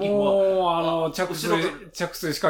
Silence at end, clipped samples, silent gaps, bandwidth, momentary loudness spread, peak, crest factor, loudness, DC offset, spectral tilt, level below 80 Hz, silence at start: 0 s; under 0.1%; none; 19 kHz; 9 LU; -10 dBFS; 14 dB; -23 LUFS; under 0.1%; -4.5 dB/octave; -54 dBFS; 0 s